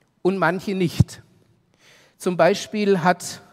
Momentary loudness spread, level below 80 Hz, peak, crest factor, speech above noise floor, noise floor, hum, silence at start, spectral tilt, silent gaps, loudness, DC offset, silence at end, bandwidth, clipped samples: 7 LU; -46 dBFS; -2 dBFS; 20 dB; 38 dB; -59 dBFS; none; 0.25 s; -6 dB/octave; none; -21 LUFS; under 0.1%; 0.15 s; 15.5 kHz; under 0.1%